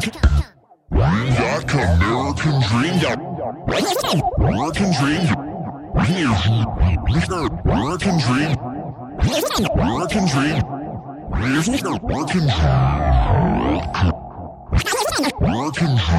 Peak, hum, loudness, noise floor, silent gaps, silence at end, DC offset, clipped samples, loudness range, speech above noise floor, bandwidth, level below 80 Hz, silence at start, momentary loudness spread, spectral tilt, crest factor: -2 dBFS; none; -19 LUFS; -40 dBFS; none; 0 s; under 0.1%; under 0.1%; 1 LU; 22 dB; 16 kHz; -26 dBFS; 0 s; 8 LU; -5.5 dB/octave; 16 dB